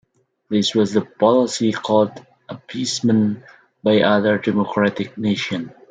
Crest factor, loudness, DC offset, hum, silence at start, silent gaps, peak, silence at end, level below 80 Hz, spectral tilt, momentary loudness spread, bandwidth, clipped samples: 18 dB; -19 LUFS; under 0.1%; none; 0.5 s; none; -2 dBFS; 0.2 s; -64 dBFS; -5 dB/octave; 10 LU; 9.4 kHz; under 0.1%